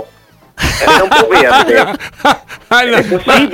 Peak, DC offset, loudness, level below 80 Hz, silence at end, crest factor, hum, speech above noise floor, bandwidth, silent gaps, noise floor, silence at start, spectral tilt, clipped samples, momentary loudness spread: 0 dBFS; under 0.1%; -9 LUFS; -32 dBFS; 0 s; 10 dB; none; 35 dB; 17 kHz; none; -44 dBFS; 0 s; -3.5 dB/octave; under 0.1%; 9 LU